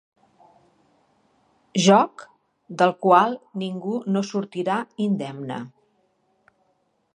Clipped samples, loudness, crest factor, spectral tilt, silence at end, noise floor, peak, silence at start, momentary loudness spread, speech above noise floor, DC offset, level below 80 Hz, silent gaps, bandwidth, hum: under 0.1%; -22 LUFS; 22 dB; -5.5 dB/octave; 1.5 s; -69 dBFS; -2 dBFS; 1.75 s; 16 LU; 47 dB; under 0.1%; -78 dBFS; none; 10 kHz; none